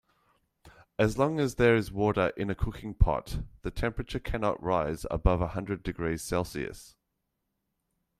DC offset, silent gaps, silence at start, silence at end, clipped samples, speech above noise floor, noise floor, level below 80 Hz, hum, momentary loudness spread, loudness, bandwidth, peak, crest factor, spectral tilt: under 0.1%; none; 0.65 s; 1.3 s; under 0.1%; 53 dB; -81 dBFS; -38 dBFS; none; 12 LU; -30 LUFS; 15 kHz; -8 dBFS; 22 dB; -6.5 dB/octave